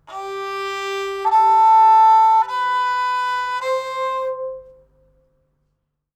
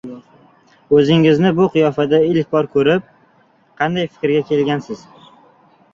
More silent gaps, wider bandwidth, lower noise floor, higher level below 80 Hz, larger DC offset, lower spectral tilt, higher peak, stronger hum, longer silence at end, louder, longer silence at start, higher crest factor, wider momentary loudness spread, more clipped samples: neither; first, 9.2 kHz vs 7.4 kHz; first, -72 dBFS vs -54 dBFS; second, -62 dBFS vs -56 dBFS; neither; second, -1.5 dB/octave vs -7.5 dB/octave; second, -6 dBFS vs -2 dBFS; neither; first, 1.55 s vs 0.95 s; about the same, -17 LUFS vs -15 LUFS; about the same, 0.1 s vs 0.05 s; about the same, 12 dB vs 16 dB; first, 16 LU vs 10 LU; neither